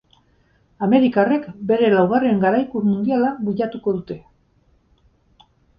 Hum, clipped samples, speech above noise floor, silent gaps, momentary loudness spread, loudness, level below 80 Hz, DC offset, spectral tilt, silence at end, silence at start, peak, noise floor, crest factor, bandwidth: none; under 0.1%; 41 dB; none; 9 LU; -19 LUFS; -58 dBFS; under 0.1%; -10.5 dB/octave; 1.6 s; 0.8 s; -2 dBFS; -59 dBFS; 18 dB; 5.4 kHz